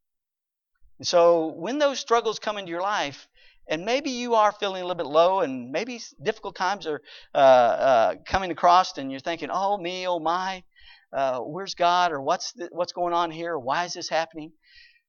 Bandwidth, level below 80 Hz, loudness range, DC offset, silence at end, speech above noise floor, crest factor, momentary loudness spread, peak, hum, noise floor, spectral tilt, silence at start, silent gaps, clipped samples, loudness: 7.2 kHz; -58 dBFS; 5 LU; under 0.1%; 0.6 s; 63 dB; 20 dB; 13 LU; -4 dBFS; none; -87 dBFS; -3.5 dB/octave; 1 s; none; under 0.1%; -24 LUFS